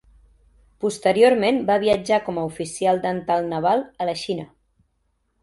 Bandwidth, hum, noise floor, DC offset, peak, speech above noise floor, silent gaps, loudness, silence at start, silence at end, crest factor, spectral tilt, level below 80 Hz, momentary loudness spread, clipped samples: 11.5 kHz; none; -70 dBFS; under 0.1%; -4 dBFS; 49 dB; none; -21 LUFS; 0.8 s; 0.95 s; 18 dB; -5 dB/octave; -56 dBFS; 12 LU; under 0.1%